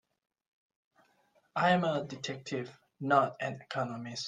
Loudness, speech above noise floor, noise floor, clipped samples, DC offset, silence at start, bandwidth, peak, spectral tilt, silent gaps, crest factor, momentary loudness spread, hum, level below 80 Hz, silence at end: -32 LUFS; 39 dB; -71 dBFS; under 0.1%; under 0.1%; 1.55 s; 9.6 kHz; -12 dBFS; -5.5 dB/octave; none; 22 dB; 12 LU; none; -76 dBFS; 0 s